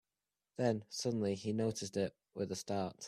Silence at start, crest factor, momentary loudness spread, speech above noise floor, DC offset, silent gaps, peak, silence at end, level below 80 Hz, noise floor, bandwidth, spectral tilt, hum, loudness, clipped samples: 0.6 s; 18 dB; 5 LU; over 52 dB; under 0.1%; none; -20 dBFS; 0 s; -74 dBFS; under -90 dBFS; 14.5 kHz; -5.5 dB/octave; none; -38 LUFS; under 0.1%